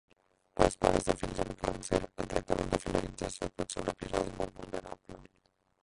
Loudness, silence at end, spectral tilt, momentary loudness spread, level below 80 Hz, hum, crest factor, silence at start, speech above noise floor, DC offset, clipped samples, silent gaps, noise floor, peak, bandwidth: -34 LUFS; 0.6 s; -5 dB/octave; 13 LU; -48 dBFS; none; 28 dB; 0.55 s; 40 dB; under 0.1%; under 0.1%; none; -73 dBFS; -6 dBFS; 11.5 kHz